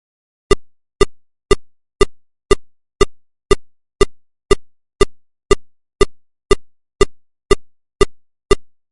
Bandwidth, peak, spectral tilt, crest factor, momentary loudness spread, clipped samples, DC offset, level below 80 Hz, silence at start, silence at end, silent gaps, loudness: 11.5 kHz; 0 dBFS; -4.5 dB/octave; 18 dB; 0 LU; under 0.1%; 0.1%; -26 dBFS; 0.5 s; 0.25 s; none; -19 LUFS